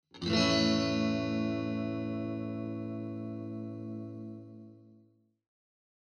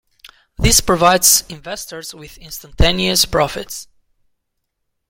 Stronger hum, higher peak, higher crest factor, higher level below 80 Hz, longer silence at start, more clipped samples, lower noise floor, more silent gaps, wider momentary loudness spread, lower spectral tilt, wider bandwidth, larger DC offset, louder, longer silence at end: neither; second, -14 dBFS vs 0 dBFS; about the same, 20 dB vs 18 dB; second, -62 dBFS vs -28 dBFS; about the same, 0.15 s vs 0.25 s; neither; second, -66 dBFS vs -73 dBFS; neither; second, 17 LU vs 21 LU; first, -5.5 dB/octave vs -2.5 dB/octave; second, 9.6 kHz vs 17 kHz; neither; second, -33 LUFS vs -13 LUFS; second, 1.1 s vs 1.25 s